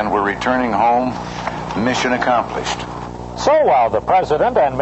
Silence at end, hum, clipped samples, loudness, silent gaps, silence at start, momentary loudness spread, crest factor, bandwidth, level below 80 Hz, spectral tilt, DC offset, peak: 0 s; 60 Hz at -35 dBFS; under 0.1%; -17 LUFS; none; 0 s; 11 LU; 14 dB; 8.4 kHz; -40 dBFS; -5 dB/octave; under 0.1%; -4 dBFS